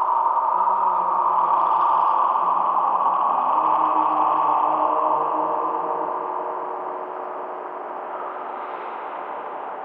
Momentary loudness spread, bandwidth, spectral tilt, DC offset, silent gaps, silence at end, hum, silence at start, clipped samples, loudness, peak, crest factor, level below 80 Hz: 12 LU; 4.8 kHz; -7.5 dB/octave; under 0.1%; none; 0 s; none; 0 s; under 0.1%; -22 LUFS; -8 dBFS; 14 dB; under -90 dBFS